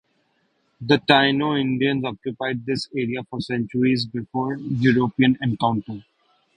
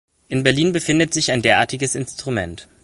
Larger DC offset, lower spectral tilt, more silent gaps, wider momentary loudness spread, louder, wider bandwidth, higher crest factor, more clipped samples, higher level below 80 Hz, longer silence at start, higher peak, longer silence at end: neither; first, -6.5 dB/octave vs -4 dB/octave; neither; first, 12 LU vs 9 LU; second, -22 LUFS vs -18 LUFS; second, 10 kHz vs 11.5 kHz; about the same, 20 dB vs 18 dB; neither; second, -58 dBFS vs -48 dBFS; first, 0.8 s vs 0.3 s; about the same, -2 dBFS vs 0 dBFS; first, 0.55 s vs 0.2 s